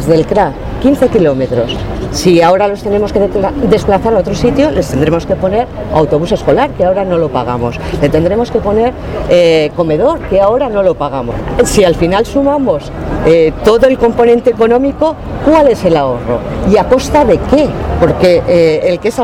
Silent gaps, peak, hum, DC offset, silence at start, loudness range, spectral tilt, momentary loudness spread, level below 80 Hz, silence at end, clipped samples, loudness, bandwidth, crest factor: none; 0 dBFS; none; under 0.1%; 0 s; 2 LU; -6.5 dB/octave; 7 LU; -26 dBFS; 0 s; 0.4%; -11 LUFS; 16 kHz; 10 dB